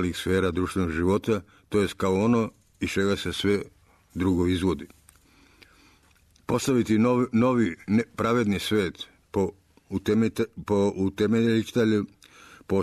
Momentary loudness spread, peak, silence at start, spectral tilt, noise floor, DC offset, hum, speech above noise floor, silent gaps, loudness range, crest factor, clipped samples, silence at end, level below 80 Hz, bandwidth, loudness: 9 LU; -12 dBFS; 0 s; -6 dB/octave; -60 dBFS; under 0.1%; none; 36 dB; none; 4 LU; 14 dB; under 0.1%; 0 s; -50 dBFS; 13.5 kHz; -25 LUFS